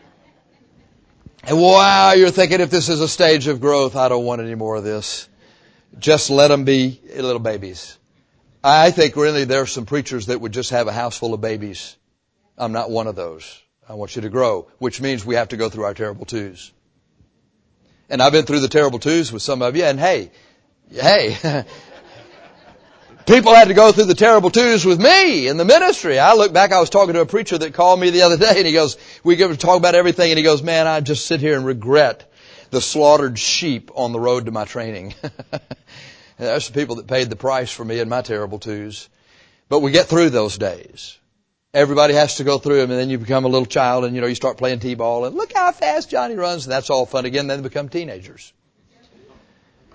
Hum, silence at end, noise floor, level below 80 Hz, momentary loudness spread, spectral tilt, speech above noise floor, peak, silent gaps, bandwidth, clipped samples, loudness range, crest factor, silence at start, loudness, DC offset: none; 1.7 s; -68 dBFS; -52 dBFS; 17 LU; -4 dB/octave; 52 dB; 0 dBFS; none; 8 kHz; under 0.1%; 12 LU; 16 dB; 1.45 s; -15 LUFS; under 0.1%